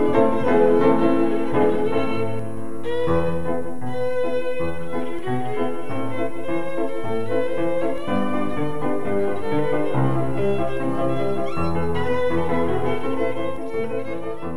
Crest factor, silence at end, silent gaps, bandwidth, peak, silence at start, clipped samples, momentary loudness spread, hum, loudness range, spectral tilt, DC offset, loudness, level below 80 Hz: 18 dB; 0 s; none; 13.5 kHz; -4 dBFS; 0 s; under 0.1%; 9 LU; none; 5 LU; -7.5 dB/octave; 9%; -23 LUFS; -46 dBFS